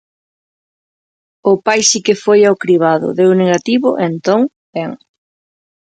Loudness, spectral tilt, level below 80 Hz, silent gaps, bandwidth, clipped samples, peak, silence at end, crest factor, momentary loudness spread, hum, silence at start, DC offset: -13 LUFS; -4 dB/octave; -62 dBFS; 4.56-4.73 s; 9.2 kHz; under 0.1%; 0 dBFS; 0.95 s; 14 dB; 10 LU; none; 1.45 s; under 0.1%